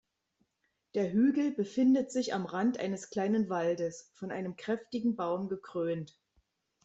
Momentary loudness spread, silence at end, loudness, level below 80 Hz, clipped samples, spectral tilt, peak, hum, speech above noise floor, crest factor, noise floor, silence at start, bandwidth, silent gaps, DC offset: 11 LU; 0.8 s; -32 LUFS; -74 dBFS; under 0.1%; -6 dB/octave; -18 dBFS; none; 49 dB; 14 dB; -80 dBFS; 0.95 s; 8.2 kHz; none; under 0.1%